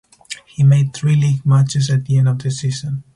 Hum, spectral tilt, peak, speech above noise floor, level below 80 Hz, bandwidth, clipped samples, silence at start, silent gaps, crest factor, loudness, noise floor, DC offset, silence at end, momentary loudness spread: none; -6.5 dB/octave; -4 dBFS; 21 dB; -50 dBFS; 11 kHz; under 0.1%; 0.3 s; none; 12 dB; -16 LUFS; -36 dBFS; under 0.1%; 0.15 s; 13 LU